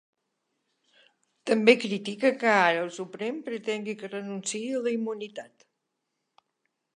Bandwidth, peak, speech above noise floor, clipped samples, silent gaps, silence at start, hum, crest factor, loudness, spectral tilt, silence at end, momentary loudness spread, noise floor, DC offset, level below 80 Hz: 11 kHz; -4 dBFS; 55 dB; under 0.1%; none; 1.45 s; none; 24 dB; -27 LUFS; -4 dB/octave; 1.5 s; 14 LU; -81 dBFS; under 0.1%; -84 dBFS